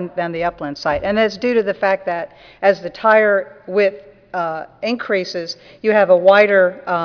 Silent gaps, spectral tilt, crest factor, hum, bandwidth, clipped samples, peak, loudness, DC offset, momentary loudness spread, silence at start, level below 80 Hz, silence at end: none; -5.5 dB/octave; 16 dB; none; 5.4 kHz; under 0.1%; 0 dBFS; -17 LUFS; under 0.1%; 13 LU; 0 s; -52 dBFS; 0 s